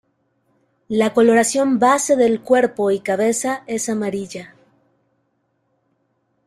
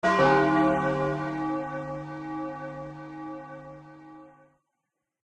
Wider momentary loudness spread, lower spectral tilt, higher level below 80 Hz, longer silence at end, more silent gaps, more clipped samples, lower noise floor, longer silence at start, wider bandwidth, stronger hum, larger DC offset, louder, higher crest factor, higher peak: second, 10 LU vs 23 LU; second, -4 dB/octave vs -7 dB/octave; second, -62 dBFS vs -56 dBFS; first, 2 s vs 0.95 s; neither; neither; second, -68 dBFS vs -83 dBFS; first, 0.9 s vs 0.05 s; first, 14.5 kHz vs 9.4 kHz; neither; neither; first, -17 LUFS vs -27 LUFS; about the same, 18 dB vs 20 dB; first, -2 dBFS vs -10 dBFS